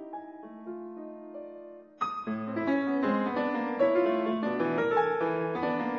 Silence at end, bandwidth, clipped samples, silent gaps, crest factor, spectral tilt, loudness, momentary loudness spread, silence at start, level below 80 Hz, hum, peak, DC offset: 0 s; 7 kHz; under 0.1%; none; 18 dB; -8 dB/octave; -29 LUFS; 17 LU; 0 s; -72 dBFS; none; -12 dBFS; under 0.1%